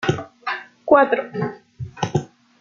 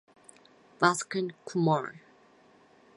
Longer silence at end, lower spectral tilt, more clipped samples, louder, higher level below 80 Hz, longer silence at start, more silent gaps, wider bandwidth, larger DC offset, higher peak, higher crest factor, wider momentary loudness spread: second, 0.35 s vs 1 s; first, -6.5 dB/octave vs -5 dB/octave; neither; first, -21 LUFS vs -29 LUFS; first, -58 dBFS vs -78 dBFS; second, 0 s vs 0.8 s; neither; second, 7.6 kHz vs 11.5 kHz; neither; first, -2 dBFS vs -6 dBFS; second, 20 dB vs 26 dB; first, 14 LU vs 8 LU